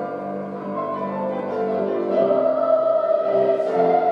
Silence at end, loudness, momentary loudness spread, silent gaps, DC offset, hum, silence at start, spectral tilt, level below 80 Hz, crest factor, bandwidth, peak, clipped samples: 0 s; -21 LUFS; 10 LU; none; under 0.1%; none; 0 s; -8.5 dB/octave; -76 dBFS; 14 dB; 5.8 kHz; -6 dBFS; under 0.1%